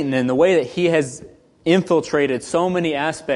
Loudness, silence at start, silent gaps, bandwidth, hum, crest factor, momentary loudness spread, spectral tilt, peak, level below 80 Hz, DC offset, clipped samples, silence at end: -19 LUFS; 0 s; none; 11.5 kHz; none; 16 dB; 7 LU; -5.5 dB/octave; -2 dBFS; -54 dBFS; under 0.1%; under 0.1%; 0 s